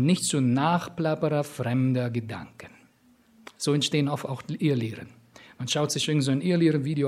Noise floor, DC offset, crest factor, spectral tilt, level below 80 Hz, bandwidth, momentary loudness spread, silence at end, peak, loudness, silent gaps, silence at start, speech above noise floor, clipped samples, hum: -60 dBFS; under 0.1%; 18 dB; -5.5 dB/octave; -68 dBFS; 15 kHz; 11 LU; 0 s; -8 dBFS; -26 LUFS; none; 0 s; 35 dB; under 0.1%; none